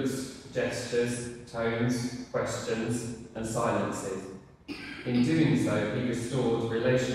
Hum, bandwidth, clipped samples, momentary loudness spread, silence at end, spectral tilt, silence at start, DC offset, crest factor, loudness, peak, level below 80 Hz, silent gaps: none; 14 kHz; under 0.1%; 13 LU; 0 s; -5.5 dB/octave; 0 s; under 0.1%; 16 dB; -30 LUFS; -14 dBFS; -56 dBFS; none